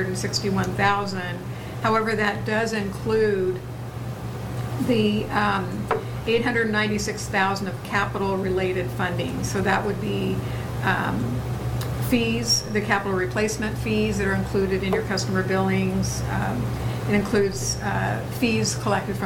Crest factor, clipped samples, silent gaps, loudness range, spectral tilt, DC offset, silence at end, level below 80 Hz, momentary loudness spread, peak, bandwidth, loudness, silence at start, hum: 18 dB; under 0.1%; none; 2 LU; -5 dB/octave; under 0.1%; 0 s; -40 dBFS; 6 LU; -6 dBFS; 18 kHz; -24 LUFS; 0 s; none